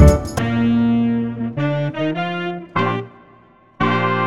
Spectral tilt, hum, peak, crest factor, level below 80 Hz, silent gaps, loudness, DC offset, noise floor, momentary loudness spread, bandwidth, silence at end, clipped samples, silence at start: -7 dB/octave; none; 0 dBFS; 18 dB; -26 dBFS; none; -19 LUFS; 0.5%; -49 dBFS; 7 LU; 14.5 kHz; 0 s; under 0.1%; 0 s